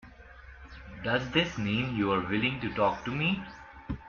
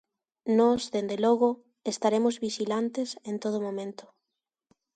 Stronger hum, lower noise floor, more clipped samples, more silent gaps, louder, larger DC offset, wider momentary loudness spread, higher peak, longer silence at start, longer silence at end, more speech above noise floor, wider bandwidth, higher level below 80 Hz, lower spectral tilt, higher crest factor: neither; second, -50 dBFS vs -87 dBFS; neither; neither; about the same, -29 LUFS vs -28 LUFS; neither; first, 20 LU vs 12 LU; about the same, -12 dBFS vs -10 dBFS; second, 0.05 s vs 0.45 s; second, 0 s vs 0.95 s; second, 21 dB vs 60 dB; second, 7.2 kHz vs 9.2 kHz; first, -50 dBFS vs -70 dBFS; about the same, -6 dB/octave vs -5 dB/octave; about the same, 18 dB vs 18 dB